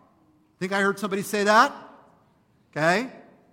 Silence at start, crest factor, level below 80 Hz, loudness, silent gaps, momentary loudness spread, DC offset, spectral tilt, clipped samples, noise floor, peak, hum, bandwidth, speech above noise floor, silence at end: 0.6 s; 22 dB; -72 dBFS; -23 LUFS; none; 18 LU; under 0.1%; -4 dB/octave; under 0.1%; -62 dBFS; -4 dBFS; none; 16.5 kHz; 40 dB; 0.35 s